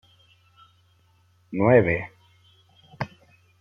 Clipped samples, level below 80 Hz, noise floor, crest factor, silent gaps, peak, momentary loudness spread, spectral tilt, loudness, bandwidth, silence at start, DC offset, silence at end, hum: under 0.1%; -58 dBFS; -61 dBFS; 22 dB; none; -4 dBFS; 17 LU; -9.5 dB/octave; -23 LUFS; 6.4 kHz; 1.5 s; under 0.1%; 0.55 s; none